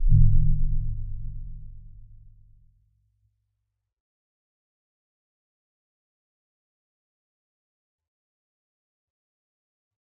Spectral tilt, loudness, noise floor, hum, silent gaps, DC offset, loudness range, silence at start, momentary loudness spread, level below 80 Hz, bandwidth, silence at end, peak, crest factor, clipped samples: -26 dB/octave; -27 LUFS; -81 dBFS; none; none; under 0.1%; 24 LU; 0 s; 25 LU; -28 dBFS; 0.3 kHz; 8.25 s; -6 dBFS; 22 dB; under 0.1%